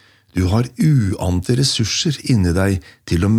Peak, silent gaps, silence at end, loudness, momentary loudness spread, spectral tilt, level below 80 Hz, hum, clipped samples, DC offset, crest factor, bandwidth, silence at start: -4 dBFS; none; 0 s; -18 LUFS; 6 LU; -5.5 dB/octave; -40 dBFS; none; under 0.1%; under 0.1%; 12 dB; 15 kHz; 0.35 s